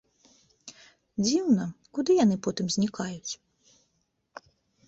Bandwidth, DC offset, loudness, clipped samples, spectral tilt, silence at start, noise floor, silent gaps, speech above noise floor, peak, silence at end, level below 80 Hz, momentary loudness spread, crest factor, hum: 8.2 kHz; under 0.1%; -27 LUFS; under 0.1%; -5 dB/octave; 0.65 s; -75 dBFS; none; 49 dB; -12 dBFS; 1.55 s; -66 dBFS; 25 LU; 18 dB; none